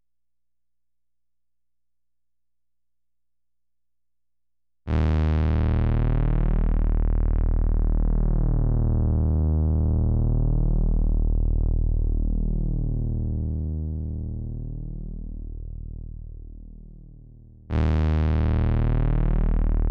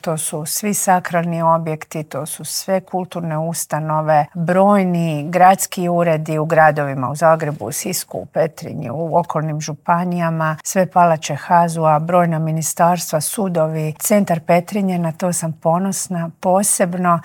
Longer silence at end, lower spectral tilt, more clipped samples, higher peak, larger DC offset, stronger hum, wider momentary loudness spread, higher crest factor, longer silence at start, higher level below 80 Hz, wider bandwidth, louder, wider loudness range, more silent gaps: about the same, 0 s vs 0 s; first, -10.5 dB/octave vs -5 dB/octave; neither; second, -12 dBFS vs 0 dBFS; neither; first, 60 Hz at -70 dBFS vs none; first, 15 LU vs 10 LU; second, 10 dB vs 16 dB; first, 4.85 s vs 0.05 s; first, -24 dBFS vs -64 dBFS; second, 4.1 kHz vs 17.5 kHz; second, -25 LUFS vs -17 LUFS; first, 10 LU vs 5 LU; neither